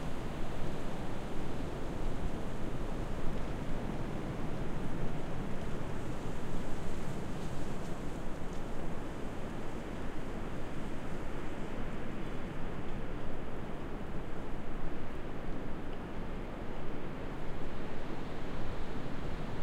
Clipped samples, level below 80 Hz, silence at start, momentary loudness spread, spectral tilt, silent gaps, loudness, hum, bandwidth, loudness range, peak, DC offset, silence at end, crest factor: under 0.1%; -40 dBFS; 0 s; 3 LU; -6.5 dB/octave; none; -42 LUFS; none; 8.8 kHz; 3 LU; -20 dBFS; under 0.1%; 0 s; 12 dB